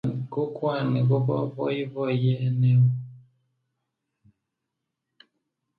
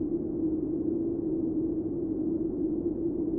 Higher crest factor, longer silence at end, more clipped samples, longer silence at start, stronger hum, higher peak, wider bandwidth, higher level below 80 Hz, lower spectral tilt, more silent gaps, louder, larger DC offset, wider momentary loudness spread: about the same, 14 dB vs 10 dB; first, 2.6 s vs 0 s; neither; about the same, 0.05 s vs 0 s; neither; first, -12 dBFS vs -20 dBFS; first, 4.7 kHz vs 1.5 kHz; second, -66 dBFS vs -50 dBFS; second, -10.5 dB/octave vs -15 dB/octave; neither; first, -25 LUFS vs -31 LUFS; neither; first, 9 LU vs 1 LU